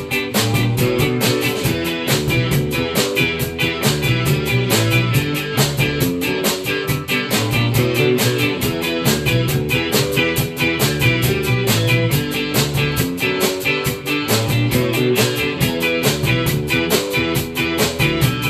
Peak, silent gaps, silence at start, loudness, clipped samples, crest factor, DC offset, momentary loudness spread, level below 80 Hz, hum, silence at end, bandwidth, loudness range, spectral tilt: -2 dBFS; none; 0 s; -17 LUFS; under 0.1%; 16 dB; under 0.1%; 3 LU; -38 dBFS; none; 0 s; 14.5 kHz; 1 LU; -4.5 dB/octave